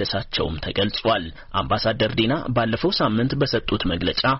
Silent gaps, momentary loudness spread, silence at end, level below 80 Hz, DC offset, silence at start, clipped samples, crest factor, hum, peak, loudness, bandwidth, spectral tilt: none; 4 LU; 0 s; -38 dBFS; under 0.1%; 0 s; under 0.1%; 14 dB; none; -8 dBFS; -22 LUFS; 6 kHz; -3.5 dB/octave